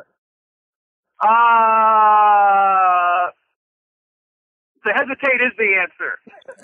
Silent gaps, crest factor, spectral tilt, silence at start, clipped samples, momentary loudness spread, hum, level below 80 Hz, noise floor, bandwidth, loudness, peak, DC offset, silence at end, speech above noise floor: 3.56-4.75 s; 12 dB; -5 dB/octave; 1.2 s; under 0.1%; 13 LU; none; -76 dBFS; under -90 dBFS; 3.7 kHz; -15 LUFS; -6 dBFS; under 0.1%; 0.1 s; over 73 dB